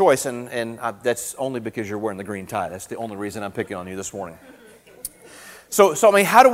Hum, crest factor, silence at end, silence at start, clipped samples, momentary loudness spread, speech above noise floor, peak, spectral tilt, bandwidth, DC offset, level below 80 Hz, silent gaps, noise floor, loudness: none; 22 dB; 0 s; 0 s; under 0.1%; 20 LU; 23 dB; 0 dBFS; -3.5 dB/octave; 16 kHz; under 0.1%; -60 dBFS; none; -44 dBFS; -22 LUFS